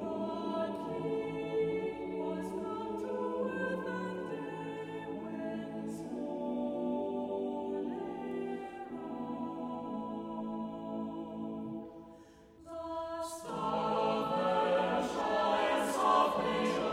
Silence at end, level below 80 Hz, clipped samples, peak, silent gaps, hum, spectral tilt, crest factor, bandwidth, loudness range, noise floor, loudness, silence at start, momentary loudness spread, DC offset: 0 s; -66 dBFS; under 0.1%; -16 dBFS; none; none; -5.5 dB/octave; 20 dB; 16 kHz; 9 LU; -57 dBFS; -36 LUFS; 0 s; 11 LU; under 0.1%